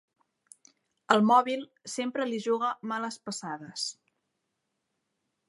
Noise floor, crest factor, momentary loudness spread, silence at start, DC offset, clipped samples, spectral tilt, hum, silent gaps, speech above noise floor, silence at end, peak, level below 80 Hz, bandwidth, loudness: -82 dBFS; 26 dB; 15 LU; 1.1 s; under 0.1%; under 0.1%; -4 dB/octave; none; none; 53 dB; 1.55 s; -4 dBFS; -84 dBFS; 11.5 kHz; -29 LUFS